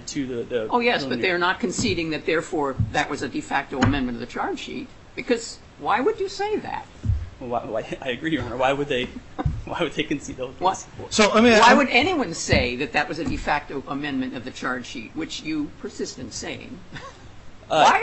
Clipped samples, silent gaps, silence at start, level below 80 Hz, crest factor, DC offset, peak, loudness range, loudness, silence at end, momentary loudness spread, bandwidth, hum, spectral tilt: under 0.1%; none; 0 s; -40 dBFS; 20 dB; under 0.1%; -2 dBFS; 10 LU; -23 LUFS; 0 s; 14 LU; 9.8 kHz; none; -4.5 dB/octave